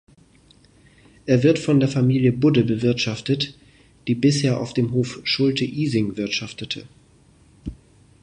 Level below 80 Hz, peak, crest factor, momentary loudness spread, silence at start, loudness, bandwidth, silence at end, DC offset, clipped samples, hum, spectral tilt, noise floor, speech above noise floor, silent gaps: -50 dBFS; -4 dBFS; 18 dB; 14 LU; 1.25 s; -21 LUFS; 10 kHz; 0.5 s; under 0.1%; under 0.1%; none; -6 dB/octave; -54 dBFS; 34 dB; none